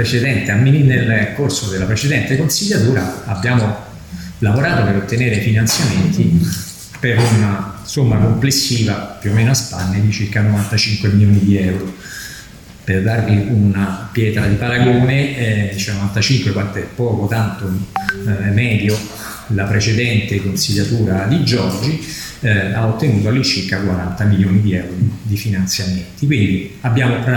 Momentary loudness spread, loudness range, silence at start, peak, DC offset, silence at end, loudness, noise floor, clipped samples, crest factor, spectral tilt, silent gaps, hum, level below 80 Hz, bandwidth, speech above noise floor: 8 LU; 2 LU; 0 s; 0 dBFS; under 0.1%; 0 s; -16 LUFS; -36 dBFS; under 0.1%; 14 dB; -5.5 dB/octave; none; none; -40 dBFS; 18 kHz; 21 dB